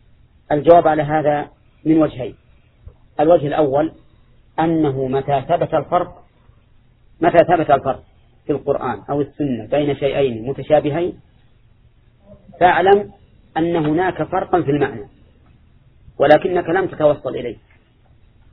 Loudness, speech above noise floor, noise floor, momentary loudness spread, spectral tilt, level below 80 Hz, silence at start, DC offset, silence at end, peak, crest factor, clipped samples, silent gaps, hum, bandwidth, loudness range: -17 LUFS; 35 dB; -52 dBFS; 13 LU; -10 dB/octave; -46 dBFS; 0.5 s; under 0.1%; 1 s; 0 dBFS; 18 dB; under 0.1%; none; none; 5.4 kHz; 3 LU